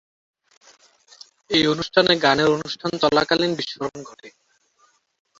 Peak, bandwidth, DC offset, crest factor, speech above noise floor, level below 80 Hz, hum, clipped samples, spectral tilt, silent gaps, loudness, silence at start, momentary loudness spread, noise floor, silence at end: -2 dBFS; 7.8 kHz; under 0.1%; 22 dB; 42 dB; -56 dBFS; none; under 0.1%; -4.5 dB/octave; none; -20 LUFS; 1.5 s; 14 LU; -62 dBFS; 1.1 s